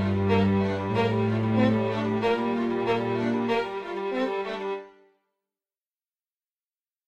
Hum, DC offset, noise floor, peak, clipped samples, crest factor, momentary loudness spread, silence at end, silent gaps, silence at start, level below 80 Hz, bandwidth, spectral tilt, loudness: none; under 0.1%; under -90 dBFS; -10 dBFS; under 0.1%; 16 dB; 8 LU; 2.2 s; none; 0 s; -58 dBFS; 8.4 kHz; -8 dB/octave; -26 LUFS